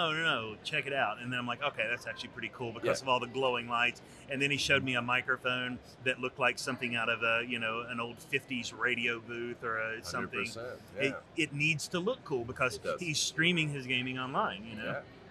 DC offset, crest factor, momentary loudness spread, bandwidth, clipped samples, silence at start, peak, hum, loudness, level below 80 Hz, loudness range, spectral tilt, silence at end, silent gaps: under 0.1%; 20 dB; 10 LU; 13.5 kHz; under 0.1%; 0 s; -14 dBFS; none; -33 LUFS; -68 dBFS; 3 LU; -3.5 dB/octave; 0 s; none